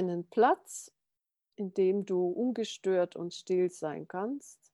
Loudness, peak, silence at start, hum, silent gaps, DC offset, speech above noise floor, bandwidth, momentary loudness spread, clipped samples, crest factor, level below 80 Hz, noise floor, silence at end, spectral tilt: -32 LUFS; -12 dBFS; 0 s; none; none; under 0.1%; 56 dB; 12.5 kHz; 13 LU; under 0.1%; 20 dB; -88 dBFS; -88 dBFS; 0.2 s; -5.5 dB/octave